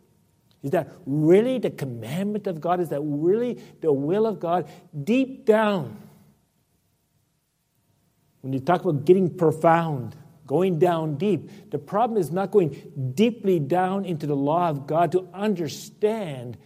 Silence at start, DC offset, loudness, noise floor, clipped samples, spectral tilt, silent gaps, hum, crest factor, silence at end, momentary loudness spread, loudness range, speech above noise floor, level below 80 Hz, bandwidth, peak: 0.65 s; under 0.1%; -24 LUFS; -71 dBFS; under 0.1%; -7.5 dB/octave; none; none; 20 dB; 0.1 s; 11 LU; 5 LU; 48 dB; -68 dBFS; 15.5 kHz; -4 dBFS